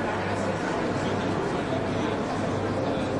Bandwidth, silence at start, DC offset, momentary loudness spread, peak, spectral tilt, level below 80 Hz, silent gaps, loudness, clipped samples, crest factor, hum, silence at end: 11.5 kHz; 0 s; under 0.1%; 1 LU; -16 dBFS; -6 dB/octave; -50 dBFS; none; -28 LUFS; under 0.1%; 12 dB; none; 0 s